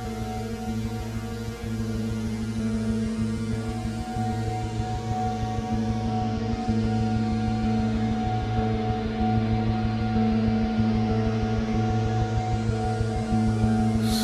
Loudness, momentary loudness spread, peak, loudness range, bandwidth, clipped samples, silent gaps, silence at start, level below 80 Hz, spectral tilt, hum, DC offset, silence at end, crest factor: -26 LUFS; 7 LU; -8 dBFS; 4 LU; 13.5 kHz; under 0.1%; none; 0 s; -36 dBFS; -7 dB/octave; none; under 0.1%; 0 s; 16 dB